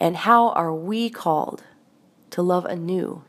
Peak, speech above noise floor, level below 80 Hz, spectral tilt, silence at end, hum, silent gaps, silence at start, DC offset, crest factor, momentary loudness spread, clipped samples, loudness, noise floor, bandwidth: -2 dBFS; 35 dB; -76 dBFS; -6.5 dB/octave; 0.05 s; none; none; 0 s; under 0.1%; 20 dB; 13 LU; under 0.1%; -22 LUFS; -57 dBFS; 15.5 kHz